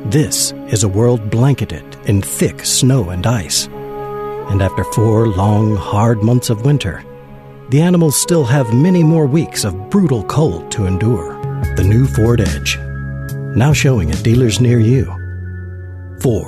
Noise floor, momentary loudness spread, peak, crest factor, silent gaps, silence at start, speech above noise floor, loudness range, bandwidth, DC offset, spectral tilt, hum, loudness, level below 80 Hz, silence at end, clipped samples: -35 dBFS; 12 LU; -2 dBFS; 12 dB; none; 0 s; 22 dB; 2 LU; 13.5 kHz; under 0.1%; -5.5 dB/octave; none; -14 LUFS; -32 dBFS; 0 s; under 0.1%